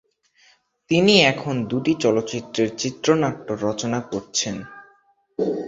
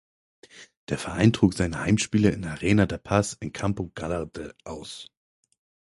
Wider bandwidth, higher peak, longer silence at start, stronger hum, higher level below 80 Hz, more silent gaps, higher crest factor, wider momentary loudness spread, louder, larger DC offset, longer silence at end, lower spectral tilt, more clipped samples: second, 8 kHz vs 11.5 kHz; first, -2 dBFS vs -6 dBFS; first, 0.9 s vs 0.55 s; neither; second, -58 dBFS vs -46 dBFS; second, none vs 0.77-0.87 s; about the same, 20 dB vs 22 dB; second, 12 LU vs 17 LU; first, -21 LUFS vs -25 LUFS; neither; second, 0 s vs 0.8 s; second, -4 dB/octave vs -6 dB/octave; neither